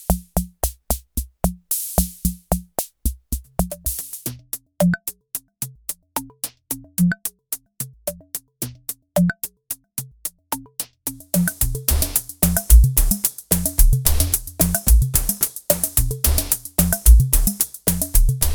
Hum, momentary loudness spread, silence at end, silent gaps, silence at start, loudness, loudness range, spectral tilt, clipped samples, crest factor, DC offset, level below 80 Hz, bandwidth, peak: none; 14 LU; 0 s; none; 0 s; -21 LUFS; 9 LU; -4.5 dB/octave; under 0.1%; 20 dB; under 0.1%; -22 dBFS; over 20 kHz; 0 dBFS